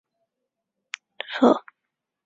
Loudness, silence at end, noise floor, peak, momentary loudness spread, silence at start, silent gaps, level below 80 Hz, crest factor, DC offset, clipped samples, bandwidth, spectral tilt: -22 LUFS; 0.65 s; -83 dBFS; -4 dBFS; 19 LU; 1.3 s; none; -74 dBFS; 24 dB; under 0.1%; under 0.1%; 7.8 kHz; -5 dB/octave